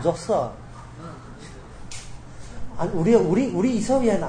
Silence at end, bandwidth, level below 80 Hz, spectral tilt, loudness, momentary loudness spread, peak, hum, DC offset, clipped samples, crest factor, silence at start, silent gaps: 0 s; 9.8 kHz; -44 dBFS; -6.5 dB/octave; -22 LUFS; 23 LU; -6 dBFS; none; under 0.1%; under 0.1%; 18 dB; 0 s; none